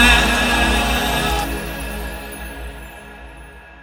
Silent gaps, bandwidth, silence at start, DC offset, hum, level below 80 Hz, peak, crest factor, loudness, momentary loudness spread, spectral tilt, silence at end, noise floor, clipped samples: none; 16.5 kHz; 0 s; under 0.1%; none; -26 dBFS; 0 dBFS; 18 dB; -18 LUFS; 23 LU; -3 dB/octave; 0 s; -39 dBFS; under 0.1%